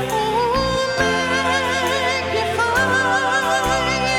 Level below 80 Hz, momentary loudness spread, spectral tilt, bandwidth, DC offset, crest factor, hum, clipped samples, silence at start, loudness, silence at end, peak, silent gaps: -38 dBFS; 3 LU; -3.5 dB/octave; 18 kHz; under 0.1%; 14 dB; none; under 0.1%; 0 s; -18 LUFS; 0 s; -6 dBFS; none